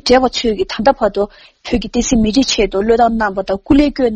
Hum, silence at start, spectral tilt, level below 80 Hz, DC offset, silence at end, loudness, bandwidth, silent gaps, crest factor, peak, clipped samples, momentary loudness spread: none; 0.05 s; -4 dB/octave; -30 dBFS; under 0.1%; 0 s; -14 LUFS; 8.8 kHz; none; 14 dB; 0 dBFS; under 0.1%; 9 LU